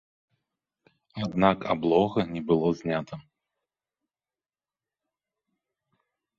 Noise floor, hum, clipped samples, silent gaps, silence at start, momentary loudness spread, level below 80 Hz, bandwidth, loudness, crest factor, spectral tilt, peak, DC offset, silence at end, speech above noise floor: under -90 dBFS; none; under 0.1%; none; 1.15 s; 16 LU; -60 dBFS; 7.4 kHz; -26 LUFS; 24 dB; -7.5 dB/octave; -6 dBFS; under 0.1%; 3.15 s; over 65 dB